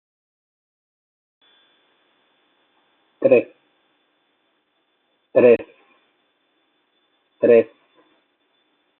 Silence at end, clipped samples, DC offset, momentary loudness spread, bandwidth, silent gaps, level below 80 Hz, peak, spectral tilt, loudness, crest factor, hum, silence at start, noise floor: 1.35 s; under 0.1%; under 0.1%; 19 LU; 4.1 kHz; none; -72 dBFS; -2 dBFS; -6 dB/octave; -17 LUFS; 22 dB; none; 3.2 s; -69 dBFS